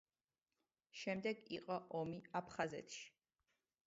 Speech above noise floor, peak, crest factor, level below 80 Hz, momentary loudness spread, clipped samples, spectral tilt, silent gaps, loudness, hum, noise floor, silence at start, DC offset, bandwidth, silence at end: over 44 dB; -26 dBFS; 22 dB; -82 dBFS; 10 LU; under 0.1%; -4 dB/octave; none; -46 LUFS; none; under -90 dBFS; 0.95 s; under 0.1%; 7.6 kHz; 0.8 s